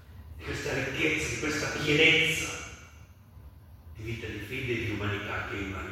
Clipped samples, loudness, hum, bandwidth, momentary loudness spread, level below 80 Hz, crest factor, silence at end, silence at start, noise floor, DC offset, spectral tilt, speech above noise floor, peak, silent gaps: under 0.1%; -28 LUFS; none; 16.5 kHz; 20 LU; -50 dBFS; 22 dB; 0 s; 0 s; -52 dBFS; under 0.1%; -3.5 dB/octave; 23 dB; -10 dBFS; none